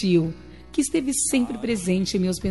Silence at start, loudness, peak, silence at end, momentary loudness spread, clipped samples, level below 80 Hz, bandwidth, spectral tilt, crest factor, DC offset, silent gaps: 0 s; -23 LUFS; -10 dBFS; 0 s; 8 LU; under 0.1%; -48 dBFS; 11.5 kHz; -4.5 dB/octave; 14 dB; 0.3%; none